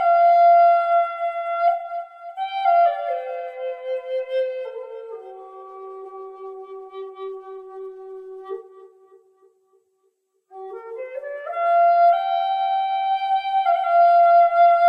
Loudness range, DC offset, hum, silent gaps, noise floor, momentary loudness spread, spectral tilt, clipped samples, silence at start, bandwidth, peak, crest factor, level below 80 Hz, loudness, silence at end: 20 LU; under 0.1%; none; none; -69 dBFS; 23 LU; -2 dB/octave; under 0.1%; 0 s; 5.2 kHz; -8 dBFS; 14 dB; -78 dBFS; -19 LUFS; 0 s